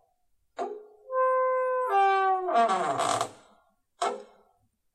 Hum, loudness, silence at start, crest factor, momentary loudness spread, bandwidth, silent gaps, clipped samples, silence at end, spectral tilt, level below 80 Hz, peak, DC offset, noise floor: none; -27 LUFS; 0.6 s; 18 dB; 14 LU; 13 kHz; none; under 0.1%; 0.7 s; -3 dB/octave; -76 dBFS; -10 dBFS; under 0.1%; -70 dBFS